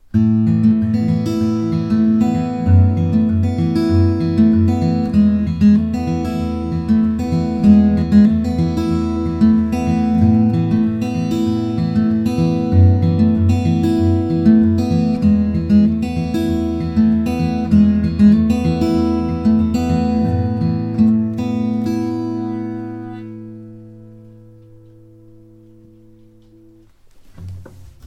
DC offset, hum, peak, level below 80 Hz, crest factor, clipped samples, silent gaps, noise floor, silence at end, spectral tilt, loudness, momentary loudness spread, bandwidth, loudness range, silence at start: under 0.1%; none; 0 dBFS; -34 dBFS; 16 dB; under 0.1%; none; -46 dBFS; 0 s; -9 dB/octave; -16 LUFS; 8 LU; 8 kHz; 5 LU; 0.15 s